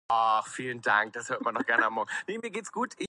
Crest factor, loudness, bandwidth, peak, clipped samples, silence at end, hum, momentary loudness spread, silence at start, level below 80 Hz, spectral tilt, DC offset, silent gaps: 20 dB; -29 LUFS; 11.5 kHz; -10 dBFS; under 0.1%; 0 s; none; 10 LU; 0.1 s; -76 dBFS; -3 dB/octave; under 0.1%; none